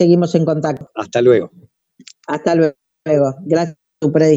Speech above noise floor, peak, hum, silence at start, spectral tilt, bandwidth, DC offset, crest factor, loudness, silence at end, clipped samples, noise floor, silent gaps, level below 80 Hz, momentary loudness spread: 31 dB; 0 dBFS; none; 0 s; -7.5 dB/octave; 8 kHz; under 0.1%; 16 dB; -16 LUFS; 0 s; under 0.1%; -46 dBFS; none; -60 dBFS; 12 LU